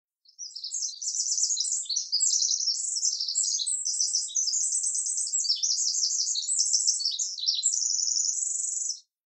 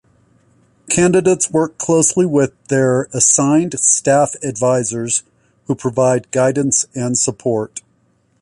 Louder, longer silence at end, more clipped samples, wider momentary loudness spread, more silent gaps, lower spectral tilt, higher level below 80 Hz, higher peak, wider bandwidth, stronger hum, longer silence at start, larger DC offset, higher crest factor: second, -25 LUFS vs -15 LUFS; second, 0.3 s vs 0.65 s; neither; about the same, 6 LU vs 8 LU; neither; second, 13 dB/octave vs -4.5 dB/octave; second, under -90 dBFS vs -54 dBFS; second, -12 dBFS vs 0 dBFS; about the same, 12 kHz vs 11.5 kHz; neither; second, 0.4 s vs 0.85 s; neither; about the same, 18 dB vs 16 dB